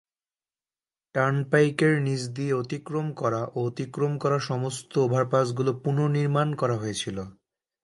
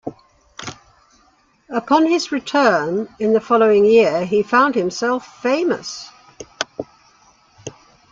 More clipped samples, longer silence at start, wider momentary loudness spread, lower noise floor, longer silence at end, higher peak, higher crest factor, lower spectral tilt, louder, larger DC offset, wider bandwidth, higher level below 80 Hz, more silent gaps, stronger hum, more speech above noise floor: neither; first, 1.15 s vs 0.05 s; second, 8 LU vs 21 LU; first, under -90 dBFS vs -57 dBFS; first, 0.55 s vs 0.4 s; second, -6 dBFS vs -2 dBFS; about the same, 20 dB vs 18 dB; first, -6.5 dB/octave vs -4.5 dB/octave; second, -26 LUFS vs -17 LUFS; neither; first, 11.5 kHz vs 7.6 kHz; about the same, -64 dBFS vs -60 dBFS; neither; neither; first, over 65 dB vs 41 dB